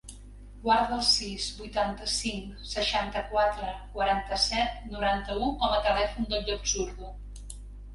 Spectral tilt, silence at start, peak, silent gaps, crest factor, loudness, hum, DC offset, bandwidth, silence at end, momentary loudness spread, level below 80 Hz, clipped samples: -2.5 dB/octave; 0.05 s; -12 dBFS; none; 18 dB; -28 LUFS; 50 Hz at -40 dBFS; under 0.1%; 11.5 kHz; 0 s; 17 LU; -42 dBFS; under 0.1%